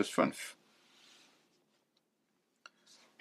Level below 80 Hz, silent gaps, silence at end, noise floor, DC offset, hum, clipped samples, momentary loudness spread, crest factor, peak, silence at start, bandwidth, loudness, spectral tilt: -90 dBFS; none; 2.7 s; -80 dBFS; under 0.1%; none; under 0.1%; 28 LU; 28 dB; -14 dBFS; 0 s; 15 kHz; -36 LUFS; -4 dB/octave